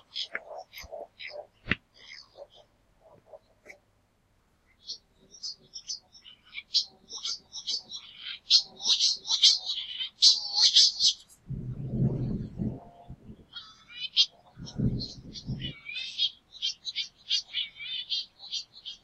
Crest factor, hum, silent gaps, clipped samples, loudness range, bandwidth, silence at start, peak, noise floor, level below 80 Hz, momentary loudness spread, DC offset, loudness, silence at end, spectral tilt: 28 dB; none; none; under 0.1%; 19 LU; 12.5 kHz; 0.15 s; -4 dBFS; -68 dBFS; -54 dBFS; 23 LU; under 0.1%; -26 LUFS; 0.1 s; -2 dB/octave